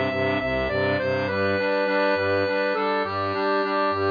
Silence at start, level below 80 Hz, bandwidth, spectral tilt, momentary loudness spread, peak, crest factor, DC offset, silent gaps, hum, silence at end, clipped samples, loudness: 0 s; -48 dBFS; 5.2 kHz; -7 dB/octave; 2 LU; -10 dBFS; 12 dB; under 0.1%; none; none; 0 s; under 0.1%; -23 LUFS